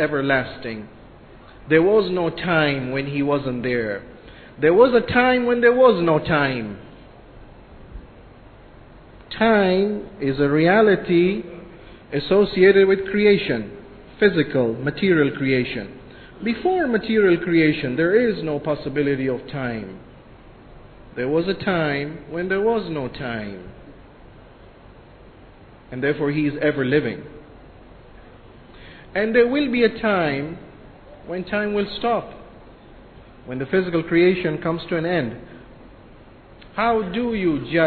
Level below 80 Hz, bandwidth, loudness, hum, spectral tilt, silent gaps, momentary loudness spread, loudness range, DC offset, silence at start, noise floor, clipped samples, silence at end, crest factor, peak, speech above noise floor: -48 dBFS; 4.6 kHz; -20 LUFS; none; -10 dB/octave; none; 16 LU; 8 LU; under 0.1%; 0 s; -46 dBFS; under 0.1%; 0 s; 20 dB; -2 dBFS; 26 dB